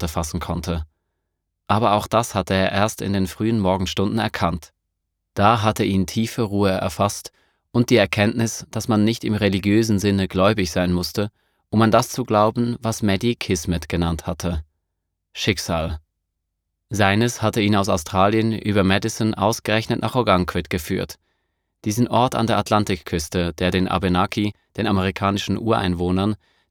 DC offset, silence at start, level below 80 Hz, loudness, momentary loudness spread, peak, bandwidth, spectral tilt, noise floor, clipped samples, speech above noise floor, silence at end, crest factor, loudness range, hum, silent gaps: under 0.1%; 0 s; -42 dBFS; -21 LUFS; 8 LU; 0 dBFS; 19 kHz; -5.5 dB/octave; -78 dBFS; under 0.1%; 58 dB; 0.35 s; 20 dB; 3 LU; none; none